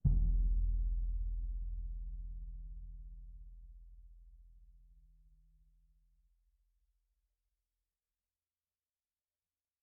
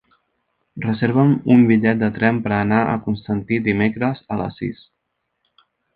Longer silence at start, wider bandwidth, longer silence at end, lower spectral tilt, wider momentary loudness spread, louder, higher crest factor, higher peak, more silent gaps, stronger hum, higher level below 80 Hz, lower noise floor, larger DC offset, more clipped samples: second, 0.05 s vs 0.75 s; second, 0.7 kHz vs 4.8 kHz; first, 5.1 s vs 1.2 s; first, -19 dB/octave vs -10.5 dB/octave; first, 24 LU vs 13 LU; second, -41 LUFS vs -18 LUFS; about the same, 22 dB vs 18 dB; second, -18 dBFS vs -2 dBFS; neither; neither; first, -40 dBFS vs -50 dBFS; first, under -90 dBFS vs -74 dBFS; neither; neither